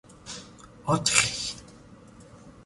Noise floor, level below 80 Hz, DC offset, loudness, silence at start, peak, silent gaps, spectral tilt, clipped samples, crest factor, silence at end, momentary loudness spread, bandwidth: -50 dBFS; -56 dBFS; under 0.1%; -25 LUFS; 0.1 s; -2 dBFS; none; -2 dB/octave; under 0.1%; 28 dB; 0.05 s; 20 LU; 12 kHz